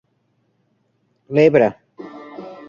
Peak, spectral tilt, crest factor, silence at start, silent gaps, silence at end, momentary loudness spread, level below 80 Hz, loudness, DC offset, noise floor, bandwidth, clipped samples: -2 dBFS; -8 dB/octave; 20 dB; 1.3 s; none; 0.15 s; 24 LU; -60 dBFS; -16 LUFS; under 0.1%; -66 dBFS; 7 kHz; under 0.1%